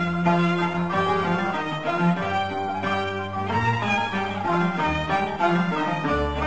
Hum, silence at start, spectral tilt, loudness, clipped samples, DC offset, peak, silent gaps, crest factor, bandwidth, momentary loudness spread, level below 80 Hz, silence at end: none; 0 s; -6.5 dB/octave; -24 LUFS; under 0.1%; 0.5%; -8 dBFS; none; 16 dB; 8.2 kHz; 4 LU; -42 dBFS; 0 s